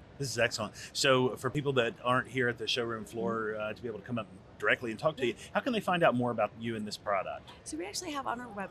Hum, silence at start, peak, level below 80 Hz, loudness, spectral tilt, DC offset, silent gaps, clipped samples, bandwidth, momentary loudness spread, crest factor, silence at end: none; 0 s; -12 dBFS; -64 dBFS; -32 LUFS; -4 dB/octave; under 0.1%; none; under 0.1%; 13.5 kHz; 11 LU; 20 dB; 0 s